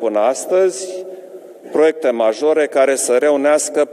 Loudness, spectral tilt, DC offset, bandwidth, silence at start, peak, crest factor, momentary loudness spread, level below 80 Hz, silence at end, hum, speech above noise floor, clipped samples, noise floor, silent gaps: -15 LUFS; -2.5 dB/octave; under 0.1%; 14.5 kHz; 0 s; -2 dBFS; 14 dB; 13 LU; -86 dBFS; 0 s; none; 21 dB; under 0.1%; -36 dBFS; none